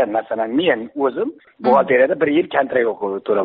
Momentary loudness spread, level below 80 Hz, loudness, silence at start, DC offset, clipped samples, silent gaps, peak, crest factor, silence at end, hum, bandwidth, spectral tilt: 8 LU; -62 dBFS; -18 LUFS; 0 s; under 0.1%; under 0.1%; none; -4 dBFS; 14 dB; 0 s; none; 5 kHz; -3 dB/octave